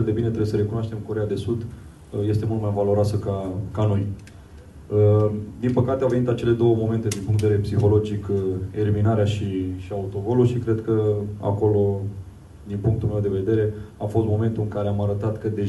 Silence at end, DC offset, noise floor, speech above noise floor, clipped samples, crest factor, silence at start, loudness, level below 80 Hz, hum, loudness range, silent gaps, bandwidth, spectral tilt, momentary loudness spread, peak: 0 s; under 0.1%; -43 dBFS; 21 dB; under 0.1%; 16 dB; 0 s; -23 LUFS; -44 dBFS; none; 3 LU; none; 12 kHz; -8.5 dB/octave; 9 LU; -6 dBFS